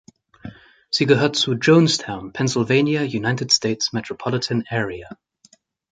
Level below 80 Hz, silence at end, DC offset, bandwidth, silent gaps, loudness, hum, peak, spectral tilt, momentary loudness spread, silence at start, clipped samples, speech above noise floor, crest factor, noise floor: -56 dBFS; 0.8 s; under 0.1%; 9.6 kHz; none; -19 LUFS; none; -2 dBFS; -4.5 dB/octave; 14 LU; 0.45 s; under 0.1%; 37 dB; 20 dB; -56 dBFS